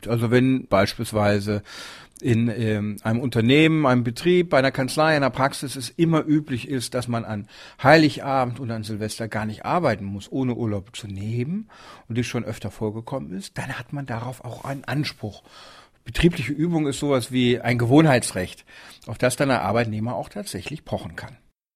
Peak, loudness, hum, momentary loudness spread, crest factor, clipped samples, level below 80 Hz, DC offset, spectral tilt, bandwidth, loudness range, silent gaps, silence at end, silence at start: 0 dBFS; -23 LUFS; none; 15 LU; 22 dB; under 0.1%; -48 dBFS; under 0.1%; -6 dB/octave; 15.5 kHz; 10 LU; none; 0.4 s; 0 s